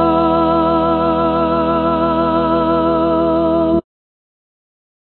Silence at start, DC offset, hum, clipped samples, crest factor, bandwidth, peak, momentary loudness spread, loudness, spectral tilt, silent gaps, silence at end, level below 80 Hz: 0 s; 1%; none; under 0.1%; 12 dB; 4.5 kHz; -2 dBFS; 2 LU; -15 LUFS; -10 dB/octave; none; 1.35 s; -38 dBFS